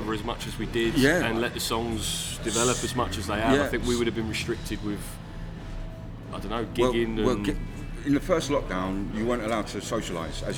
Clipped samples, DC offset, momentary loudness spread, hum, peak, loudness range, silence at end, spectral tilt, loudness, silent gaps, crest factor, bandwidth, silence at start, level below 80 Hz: under 0.1%; under 0.1%; 14 LU; none; -6 dBFS; 5 LU; 0 s; -4.5 dB/octave; -27 LUFS; none; 22 dB; over 20 kHz; 0 s; -38 dBFS